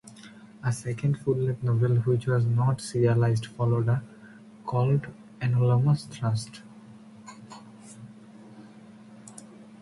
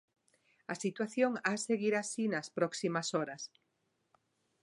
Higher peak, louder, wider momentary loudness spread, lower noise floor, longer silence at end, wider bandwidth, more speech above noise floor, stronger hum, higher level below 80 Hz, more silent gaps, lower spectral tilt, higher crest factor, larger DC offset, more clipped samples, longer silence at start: first, -10 dBFS vs -18 dBFS; first, -26 LUFS vs -35 LUFS; first, 24 LU vs 12 LU; second, -49 dBFS vs -80 dBFS; second, 0.2 s vs 1.15 s; about the same, 11.5 kHz vs 11.5 kHz; second, 24 dB vs 46 dB; neither; first, -58 dBFS vs -86 dBFS; neither; first, -7.5 dB/octave vs -4 dB/octave; about the same, 16 dB vs 20 dB; neither; neither; second, 0.05 s vs 0.7 s